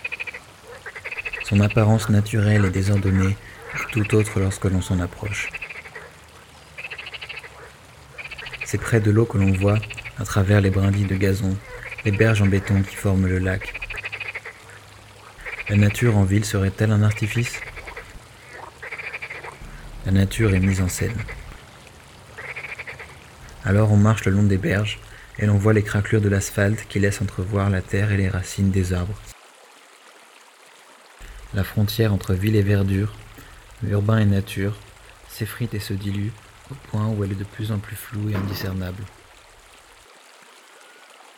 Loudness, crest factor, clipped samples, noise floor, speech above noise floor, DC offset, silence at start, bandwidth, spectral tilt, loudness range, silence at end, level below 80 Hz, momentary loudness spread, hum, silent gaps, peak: -22 LUFS; 20 dB; under 0.1%; -49 dBFS; 29 dB; under 0.1%; 0 s; 16.5 kHz; -6.5 dB/octave; 8 LU; 2.3 s; -44 dBFS; 20 LU; none; none; -2 dBFS